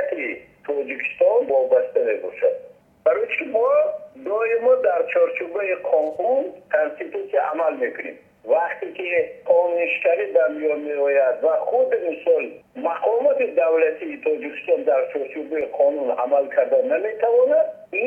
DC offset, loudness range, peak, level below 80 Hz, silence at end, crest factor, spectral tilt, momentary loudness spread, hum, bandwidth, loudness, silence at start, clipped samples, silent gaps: under 0.1%; 2 LU; -6 dBFS; -72 dBFS; 0 s; 14 dB; -6 dB/octave; 9 LU; none; 3.4 kHz; -21 LUFS; 0 s; under 0.1%; none